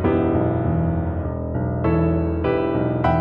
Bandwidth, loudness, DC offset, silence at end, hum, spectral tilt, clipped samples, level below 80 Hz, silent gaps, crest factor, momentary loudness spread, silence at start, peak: 5 kHz; -21 LUFS; under 0.1%; 0 s; none; -11.5 dB/octave; under 0.1%; -32 dBFS; none; 14 dB; 6 LU; 0 s; -6 dBFS